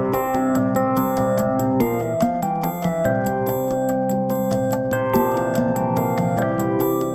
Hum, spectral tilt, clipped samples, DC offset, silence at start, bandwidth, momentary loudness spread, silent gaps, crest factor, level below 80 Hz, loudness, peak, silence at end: none; -7 dB/octave; under 0.1%; under 0.1%; 0 s; 16.5 kHz; 2 LU; none; 14 dB; -46 dBFS; -21 LUFS; -6 dBFS; 0 s